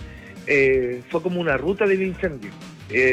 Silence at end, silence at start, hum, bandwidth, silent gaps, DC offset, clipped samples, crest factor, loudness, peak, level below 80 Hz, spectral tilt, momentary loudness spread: 0 s; 0 s; none; 8.8 kHz; none; under 0.1%; under 0.1%; 14 dB; -21 LUFS; -8 dBFS; -46 dBFS; -6.5 dB/octave; 19 LU